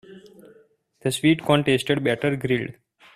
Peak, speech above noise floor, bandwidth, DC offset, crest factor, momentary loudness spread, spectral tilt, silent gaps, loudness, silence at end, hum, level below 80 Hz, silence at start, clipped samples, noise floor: -4 dBFS; 36 dB; 15 kHz; under 0.1%; 20 dB; 8 LU; -5.5 dB/octave; none; -22 LUFS; 0.45 s; none; -58 dBFS; 0.1 s; under 0.1%; -57 dBFS